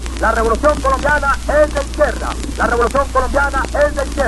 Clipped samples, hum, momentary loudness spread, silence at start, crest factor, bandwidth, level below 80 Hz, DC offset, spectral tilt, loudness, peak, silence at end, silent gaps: under 0.1%; none; 3 LU; 0 s; 14 dB; 12.5 kHz; -22 dBFS; under 0.1%; -5 dB/octave; -16 LUFS; 0 dBFS; 0 s; none